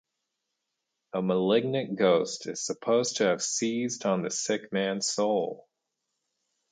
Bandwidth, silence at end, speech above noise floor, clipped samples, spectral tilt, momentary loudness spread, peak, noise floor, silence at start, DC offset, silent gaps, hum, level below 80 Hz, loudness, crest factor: 9.6 kHz; 1.15 s; 56 dB; under 0.1%; -4 dB/octave; 9 LU; -10 dBFS; -83 dBFS; 1.15 s; under 0.1%; none; none; -76 dBFS; -28 LUFS; 18 dB